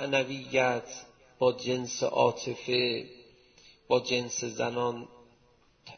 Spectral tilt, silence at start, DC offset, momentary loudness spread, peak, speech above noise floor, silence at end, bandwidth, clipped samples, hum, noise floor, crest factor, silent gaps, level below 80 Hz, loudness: -3.5 dB/octave; 0 s; under 0.1%; 13 LU; -10 dBFS; 35 dB; 0 s; 6.6 kHz; under 0.1%; none; -64 dBFS; 20 dB; none; -68 dBFS; -29 LUFS